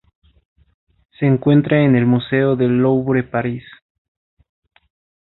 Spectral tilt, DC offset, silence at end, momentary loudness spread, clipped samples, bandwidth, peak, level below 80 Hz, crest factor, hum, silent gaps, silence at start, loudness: -13 dB/octave; under 0.1%; 1.6 s; 9 LU; under 0.1%; 4.1 kHz; -2 dBFS; -52 dBFS; 16 dB; none; none; 1.2 s; -16 LUFS